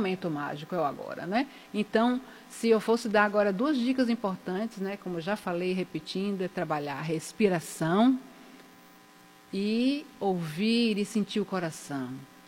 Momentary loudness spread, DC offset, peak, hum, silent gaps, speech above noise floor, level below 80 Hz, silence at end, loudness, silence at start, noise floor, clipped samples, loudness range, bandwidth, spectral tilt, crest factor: 10 LU; under 0.1%; -10 dBFS; none; none; 26 dB; -68 dBFS; 0.2 s; -29 LUFS; 0 s; -55 dBFS; under 0.1%; 4 LU; 16 kHz; -5.5 dB/octave; 20 dB